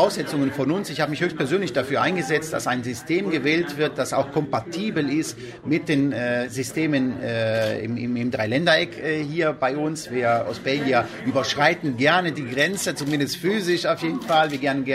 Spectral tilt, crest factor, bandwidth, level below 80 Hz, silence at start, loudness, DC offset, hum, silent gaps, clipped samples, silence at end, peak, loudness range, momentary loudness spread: -5 dB/octave; 18 dB; 16 kHz; -60 dBFS; 0 s; -23 LUFS; under 0.1%; none; none; under 0.1%; 0 s; -4 dBFS; 2 LU; 6 LU